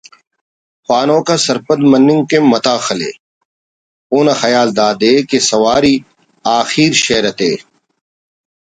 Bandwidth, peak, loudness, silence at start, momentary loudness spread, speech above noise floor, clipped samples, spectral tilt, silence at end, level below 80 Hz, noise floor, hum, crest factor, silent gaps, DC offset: 9.6 kHz; 0 dBFS; -12 LUFS; 0.9 s; 8 LU; over 79 dB; under 0.1%; -4 dB/octave; 1 s; -52 dBFS; under -90 dBFS; none; 14 dB; 3.20-4.10 s; under 0.1%